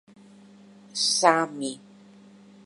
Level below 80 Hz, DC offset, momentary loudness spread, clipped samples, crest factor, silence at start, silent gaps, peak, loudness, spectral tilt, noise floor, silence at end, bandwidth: -84 dBFS; under 0.1%; 16 LU; under 0.1%; 26 dB; 0.95 s; none; -2 dBFS; -24 LUFS; -1.5 dB/octave; -51 dBFS; 0.85 s; 11.5 kHz